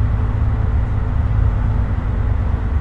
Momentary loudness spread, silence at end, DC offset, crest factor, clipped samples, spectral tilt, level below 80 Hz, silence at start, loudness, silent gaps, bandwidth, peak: 2 LU; 0 s; under 0.1%; 12 dB; under 0.1%; -9.5 dB/octave; -20 dBFS; 0 s; -19 LUFS; none; 4.1 kHz; -6 dBFS